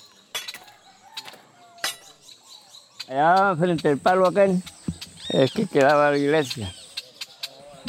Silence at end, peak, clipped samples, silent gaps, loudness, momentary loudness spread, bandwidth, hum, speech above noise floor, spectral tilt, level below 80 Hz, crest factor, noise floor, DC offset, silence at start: 0 s; -6 dBFS; under 0.1%; none; -21 LUFS; 20 LU; 17 kHz; none; 31 dB; -5 dB/octave; -60 dBFS; 18 dB; -50 dBFS; under 0.1%; 0.35 s